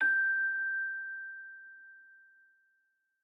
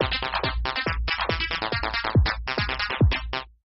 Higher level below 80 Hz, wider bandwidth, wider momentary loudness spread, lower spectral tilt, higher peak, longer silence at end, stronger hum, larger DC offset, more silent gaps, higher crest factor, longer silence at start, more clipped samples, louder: second, under -90 dBFS vs -32 dBFS; second, 3.9 kHz vs 6 kHz; first, 24 LU vs 4 LU; about the same, -2 dB/octave vs -3 dB/octave; second, -20 dBFS vs -10 dBFS; first, 1.2 s vs 0.2 s; neither; neither; neither; about the same, 14 dB vs 16 dB; about the same, 0 s vs 0 s; neither; second, -32 LUFS vs -25 LUFS